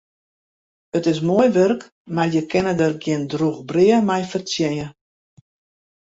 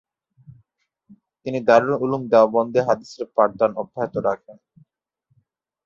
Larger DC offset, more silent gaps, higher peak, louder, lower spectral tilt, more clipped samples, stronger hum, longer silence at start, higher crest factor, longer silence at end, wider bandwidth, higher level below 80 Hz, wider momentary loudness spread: neither; first, 1.92-2.05 s vs none; about the same, -4 dBFS vs -2 dBFS; about the same, -20 LUFS vs -20 LUFS; about the same, -6 dB/octave vs -7 dB/octave; neither; neither; first, 0.95 s vs 0.5 s; about the same, 16 dB vs 20 dB; second, 1.15 s vs 1.35 s; about the same, 8 kHz vs 7.4 kHz; about the same, -58 dBFS vs -62 dBFS; about the same, 10 LU vs 11 LU